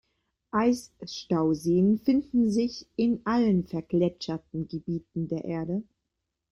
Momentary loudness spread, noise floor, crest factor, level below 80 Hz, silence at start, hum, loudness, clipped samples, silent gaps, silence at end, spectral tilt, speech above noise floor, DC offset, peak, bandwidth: 11 LU; -83 dBFS; 14 dB; -58 dBFS; 0.55 s; none; -27 LUFS; under 0.1%; none; 0.7 s; -7 dB/octave; 57 dB; under 0.1%; -12 dBFS; 12 kHz